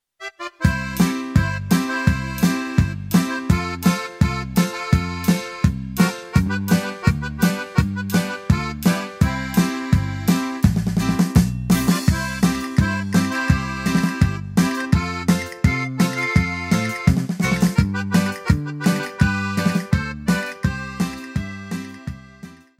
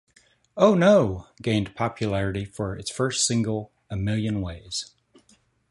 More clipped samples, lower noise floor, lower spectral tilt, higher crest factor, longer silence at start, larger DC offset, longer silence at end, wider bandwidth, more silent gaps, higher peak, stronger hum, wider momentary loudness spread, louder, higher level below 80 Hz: neither; second, -42 dBFS vs -62 dBFS; about the same, -6 dB/octave vs -5 dB/octave; about the same, 18 dB vs 20 dB; second, 0.2 s vs 0.55 s; neither; second, 0.25 s vs 0.85 s; first, 16 kHz vs 11.5 kHz; neither; about the same, -2 dBFS vs -4 dBFS; neither; second, 4 LU vs 14 LU; first, -20 LUFS vs -24 LUFS; first, -32 dBFS vs -48 dBFS